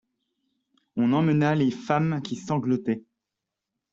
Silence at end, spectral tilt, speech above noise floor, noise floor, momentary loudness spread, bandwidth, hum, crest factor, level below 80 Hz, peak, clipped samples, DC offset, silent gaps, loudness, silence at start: 0.9 s; -7.5 dB/octave; 62 dB; -86 dBFS; 9 LU; 7.6 kHz; none; 18 dB; -66 dBFS; -8 dBFS; under 0.1%; under 0.1%; none; -25 LUFS; 0.95 s